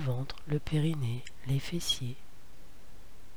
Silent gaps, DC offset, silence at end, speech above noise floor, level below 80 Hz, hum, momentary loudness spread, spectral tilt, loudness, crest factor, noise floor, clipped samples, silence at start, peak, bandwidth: none; 1%; 0.05 s; 21 dB; -50 dBFS; none; 10 LU; -5.5 dB/octave; -34 LUFS; 18 dB; -54 dBFS; under 0.1%; 0 s; -18 dBFS; over 20 kHz